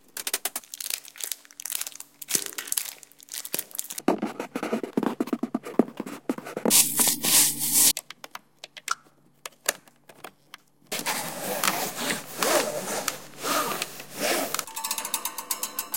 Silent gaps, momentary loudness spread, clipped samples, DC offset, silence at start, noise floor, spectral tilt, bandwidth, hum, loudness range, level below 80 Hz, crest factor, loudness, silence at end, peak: none; 18 LU; under 0.1%; under 0.1%; 0.15 s; -59 dBFS; -1 dB/octave; 17 kHz; none; 9 LU; -70 dBFS; 28 dB; -26 LUFS; 0 s; 0 dBFS